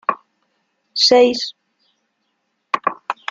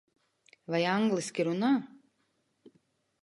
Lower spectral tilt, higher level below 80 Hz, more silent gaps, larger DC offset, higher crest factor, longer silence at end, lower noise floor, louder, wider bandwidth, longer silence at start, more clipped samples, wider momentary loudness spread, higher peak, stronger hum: second, -1.5 dB/octave vs -5.5 dB/octave; first, -66 dBFS vs -82 dBFS; neither; neither; about the same, 18 dB vs 16 dB; second, 0.2 s vs 1.4 s; second, -71 dBFS vs -76 dBFS; first, -17 LUFS vs -30 LUFS; second, 7.8 kHz vs 11.5 kHz; second, 0.1 s vs 0.7 s; neither; about the same, 16 LU vs 15 LU; first, -2 dBFS vs -16 dBFS; neither